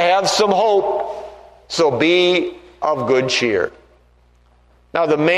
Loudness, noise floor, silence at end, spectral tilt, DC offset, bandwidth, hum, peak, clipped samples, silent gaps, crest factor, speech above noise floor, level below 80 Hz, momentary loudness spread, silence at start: -17 LUFS; -53 dBFS; 0 s; -4 dB/octave; under 0.1%; 13 kHz; 60 Hz at -50 dBFS; -2 dBFS; under 0.1%; none; 16 dB; 37 dB; -54 dBFS; 12 LU; 0 s